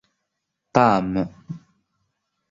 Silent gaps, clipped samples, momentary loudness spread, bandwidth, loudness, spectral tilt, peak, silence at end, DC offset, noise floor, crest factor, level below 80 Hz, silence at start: none; under 0.1%; 21 LU; 7.8 kHz; -21 LUFS; -7 dB/octave; -2 dBFS; 0.9 s; under 0.1%; -79 dBFS; 22 dB; -54 dBFS; 0.75 s